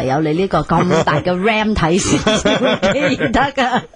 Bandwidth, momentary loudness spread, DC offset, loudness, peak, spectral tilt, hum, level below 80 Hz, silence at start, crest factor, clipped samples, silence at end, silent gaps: 10.5 kHz; 2 LU; under 0.1%; -15 LUFS; -2 dBFS; -5 dB/octave; none; -34 dBFS; 0 s; 12 dB; under 0.1%; 0.1 s; none